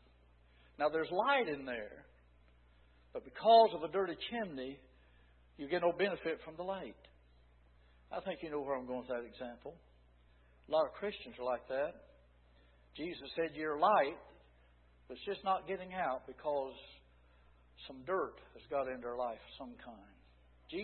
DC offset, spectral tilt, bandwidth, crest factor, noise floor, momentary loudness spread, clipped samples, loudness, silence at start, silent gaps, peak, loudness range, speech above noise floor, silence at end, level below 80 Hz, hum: under 0.1%; -2.5 dB/octave; 4.3 kHz; 24 dB; -66 dBFS; 19 LU; under 0.1%; -37 LUFS; 0.8 s; none; -16 dBFS; 9 LU; 29 dB; 0 s; -66 dBFS; none